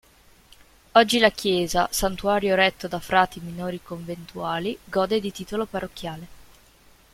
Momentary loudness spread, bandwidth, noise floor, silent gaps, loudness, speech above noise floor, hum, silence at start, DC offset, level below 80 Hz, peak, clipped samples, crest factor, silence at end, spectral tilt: 15 LU; 16.5 kHz; -55 dBFS; none; -23 LUFS; 31 dB; none; 0.95 s; under 0.1%; -48 dBFS; -2 dBFS; under 0.1%; 22 dB; 0.7 s; -4 dB/octave